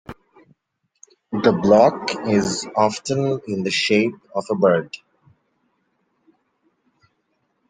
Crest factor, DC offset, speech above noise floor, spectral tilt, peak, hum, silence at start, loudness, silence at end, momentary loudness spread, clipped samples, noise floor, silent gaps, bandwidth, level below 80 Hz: 20 dB; under 0.1%; 54 dB; -5 dB/octave; -2 dBFS; none; 0.1 s; -19 LUFS; 2.75 s; 15 LU; under 0.1%; -73 dBFS; none; 9.6 kHz; -60 dBFS